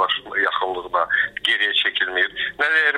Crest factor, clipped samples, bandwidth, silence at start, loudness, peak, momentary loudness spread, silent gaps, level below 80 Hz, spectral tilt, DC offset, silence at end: 14 dB; under 0.1%; 15 kHz; 0 s; -19 LUFS; -6 dBFS; 5 LU; none; -58 dBFS; -1.5 dB/octave; under 0.1%; 0 s